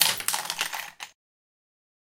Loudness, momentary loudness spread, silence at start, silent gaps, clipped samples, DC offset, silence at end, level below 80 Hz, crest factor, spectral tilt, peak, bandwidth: -27 LUFS; 18 LU; 0 s; none; under 0.1%; under 0.1%; 1.05 s; -72 dBFS; 32 dB; 1.5 dB/octave; 0 dBFS; 17 kHz